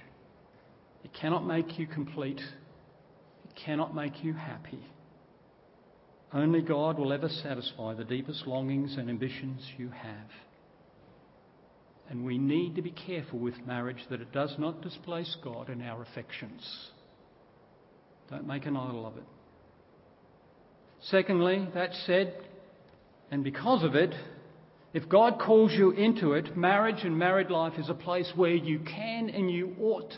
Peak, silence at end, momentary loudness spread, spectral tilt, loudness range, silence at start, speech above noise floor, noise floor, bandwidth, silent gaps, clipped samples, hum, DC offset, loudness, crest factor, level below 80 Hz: -8 dBFS; 0 s; 17 LU; -10 dB/octave; 16 LU; 1.05 s; 30 dB; -60 dBFS; 5.8 kHz; none; under 0.1%; none; under 0.1%; -30 LUFS; 22 dB; -72 dBFS